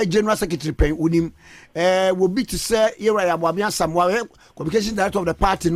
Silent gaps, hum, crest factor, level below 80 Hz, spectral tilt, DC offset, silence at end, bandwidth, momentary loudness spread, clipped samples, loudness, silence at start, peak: none; none; 14 dB; -34 dBFS; -5 dB/octave; under 0.1%; 0 s; 16 kHz; 6 LU; under 0.1%; -20 LUFS; 0 s; -6 dBFS